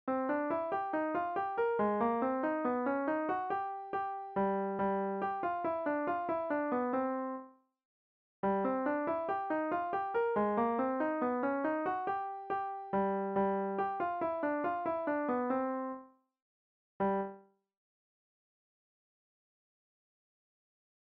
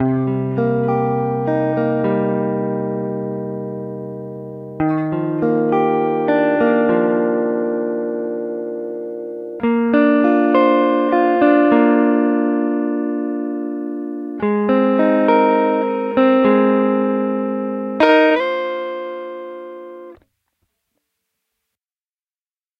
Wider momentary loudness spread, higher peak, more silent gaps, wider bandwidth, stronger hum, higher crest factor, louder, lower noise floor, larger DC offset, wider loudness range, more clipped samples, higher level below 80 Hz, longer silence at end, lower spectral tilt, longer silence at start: second, 6 LU vs 14 LU; second, -20 dBFS vs 0 dBFS; first, 7.85-8.43 s, 16.42-17.00 s vs none; about the same, 5.4 kHz vs 5.4 kHz; neither; about the same, 14 dB vs 16 dB; second, -35 LUFS vs -17 LUFS; second, -55 dBFS vs under -90 dBFS; neither; about the same, 7 LU vs 7 LU; neither; second, -72 dBFS vs -60 dBFS; first, 3.75 s vs 2.65 s; second, -6 dB/octave vs -9 dB/octave; about the same, 0.05 s vs 0 s